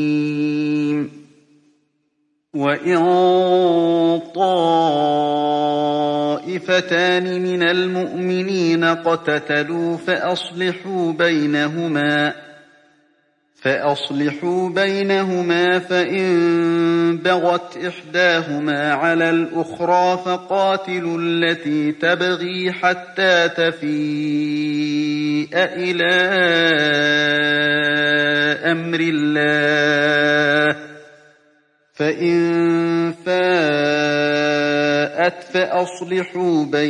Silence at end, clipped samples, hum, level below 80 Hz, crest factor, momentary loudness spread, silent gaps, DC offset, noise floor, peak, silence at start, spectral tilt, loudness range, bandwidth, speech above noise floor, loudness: 0 s; under 0.1%; none; -70 dBFS; 16 dB; 7 LU; none; under 0.1%; -68 dBFS; -2 dBFS; 0 s; -5.5 dB/octave; 4 LU; 10 kHz; 50 dB; -18 LUFS